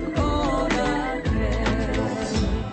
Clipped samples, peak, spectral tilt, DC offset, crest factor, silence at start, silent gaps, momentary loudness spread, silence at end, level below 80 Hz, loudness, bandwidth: under 0.1%; -10 dBFS; -6 dB/octave; under 0.1%; 12 dB; 0 s; none; 3 LU; 0 s; -30 dBFS; -24 LUFS; 8.8 kHz